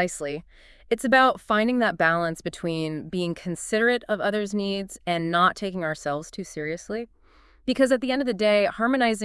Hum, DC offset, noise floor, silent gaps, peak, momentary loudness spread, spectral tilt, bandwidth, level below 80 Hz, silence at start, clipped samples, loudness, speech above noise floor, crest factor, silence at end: none; under 0.1%; -56 dBFS; none; -6 dBFS; 11 LU; -4.5 dB/octave; 12 kHz; -56 dBFS; 0 s; under 0.1%; -24 LUFS; 31 dB; 18 dB; 0 s